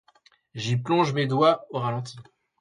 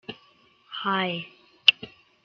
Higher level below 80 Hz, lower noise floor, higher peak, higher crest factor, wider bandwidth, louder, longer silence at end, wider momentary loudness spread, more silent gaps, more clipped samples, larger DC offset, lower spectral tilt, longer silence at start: first, -66 dBFS vs -74 dBFS; about the same, -61 dBFS vs -60 dBFS; second, -8 dBFS vs -2 dBFS; second, 18 dB vs 26 dB; first, 10.5 kHz vs 7.6 kHz; about the same, -24 LUFS vs -23 LUFS; about the same, 0.4 s vs 0.35 s; second, 14 LU vs 23 LU; neither; neither; neither; first, -6.5 dB/octave vs 0 dB/octave; first, 0.55 s vs 0.1 s